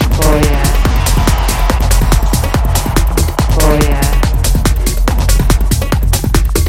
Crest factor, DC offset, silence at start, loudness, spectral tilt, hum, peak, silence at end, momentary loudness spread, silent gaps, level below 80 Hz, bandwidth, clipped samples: 10 dB; under 0.1%; 0 s; -13 LUFS; -5 dB/octave; none; 0 dBFS; 0 s; 3 LU; none; -12 dBFS; 16.5 kHz; under 0.1%